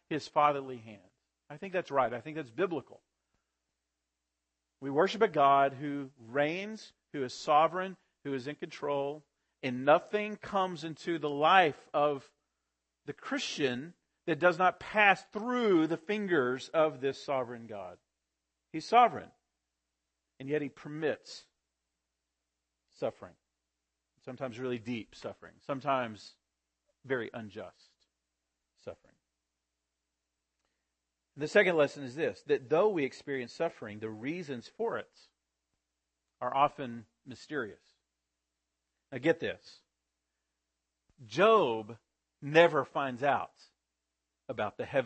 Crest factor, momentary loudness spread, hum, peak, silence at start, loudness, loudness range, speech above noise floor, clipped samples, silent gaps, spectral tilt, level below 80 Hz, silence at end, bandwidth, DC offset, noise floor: 24 dB; 20 LU; none; -8 dBFS; 0.1 s; -31 LUFS; 11 LU; 55 dB; under 0.1%; none; -5.5 dB/octave; -76 dBFS; 0 s; 8.6 kHz; under 0.1%; -87 dBFS